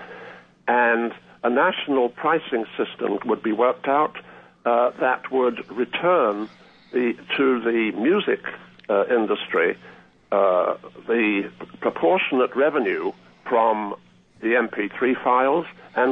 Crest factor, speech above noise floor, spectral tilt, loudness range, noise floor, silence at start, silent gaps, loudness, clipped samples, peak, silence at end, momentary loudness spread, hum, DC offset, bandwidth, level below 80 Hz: 16 dB; 22 dB; -7.5 dB/octave; 1 LU; -43 dBFS; 0 s; none; -22 LUFS; under 0.1%; -6 dBFS; 0 s; 11 LU; 60 Hz at -55 dBFS; under 0.1%; 5.4 kHz; -72 dBFS